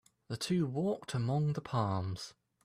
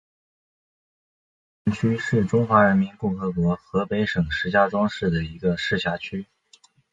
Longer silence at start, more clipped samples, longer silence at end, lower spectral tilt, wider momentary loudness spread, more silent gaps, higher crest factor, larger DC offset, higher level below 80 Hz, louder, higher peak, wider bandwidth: second, 0.3 s vs 1.65 s; neither; second, 0.35 s vs 0.7 s; about the same, -6.5 dB/octave vs -7 dB/octave; about the same, 11 LU vs 9 LU; neither; second, 16 dB vs 22 dB; neither; second, -68 dBFS vs -46 dBFS; second, -35 LUFS vs -23 LUFS; second, -20 dBFS vs -2 dBFS; first, 14.5 kHz vs 7.8 kHz